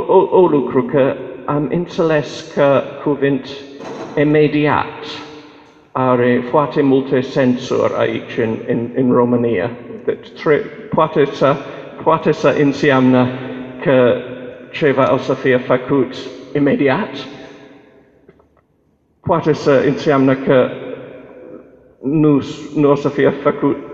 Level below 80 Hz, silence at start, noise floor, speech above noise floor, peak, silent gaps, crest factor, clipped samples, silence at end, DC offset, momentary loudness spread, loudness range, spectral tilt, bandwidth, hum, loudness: -54 dBFS; 0 s; -59 dBFS; 44 dB; 0 dBFS; none; 16 dB; under 0.1%; 0 s; under 0.1%; 15 LU; 3 LU; -7.5 dB/octave; 7.6 kHz; none; -15 LUFS